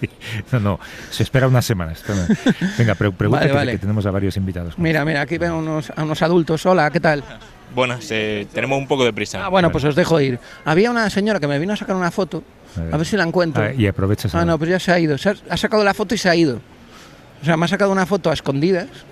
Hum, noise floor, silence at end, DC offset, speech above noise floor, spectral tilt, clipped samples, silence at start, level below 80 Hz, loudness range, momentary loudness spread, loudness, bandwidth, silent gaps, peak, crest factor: none; -42 dBFS; 0 s; under 0.1%; 24 dB; -6 dB/octave; under 0.1%; 0 s; -42 dBFS; 2 LU; 8 LU; -18 LUFS; 15 kHz; none; -4 dBFS; 14 dB